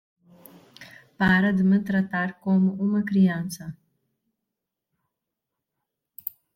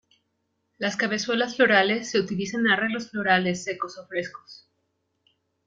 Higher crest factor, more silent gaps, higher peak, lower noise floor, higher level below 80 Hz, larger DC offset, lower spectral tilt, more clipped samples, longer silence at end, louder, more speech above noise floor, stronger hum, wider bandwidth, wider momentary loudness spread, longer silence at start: about the same, 18 dB vs 22 dB; neither; second, -8 dBFS vs -4 dBFS; first, -84 dBFS vs -75 dBFS; first, -58 dBFS vs -68 dBFS; neither; first, -7 dB/octave vs -4 dB/octave; neither; second, 0.25 s vs 1.1 s; about the same, -23 LUFS vs -24 LUFS; first, 62 dB vs 51 dB; neither; first, 16.5 kHz vs 9.2 kHz; first, 16 LU vs 13 LU; about the same, 0.8 s vs 0.8 s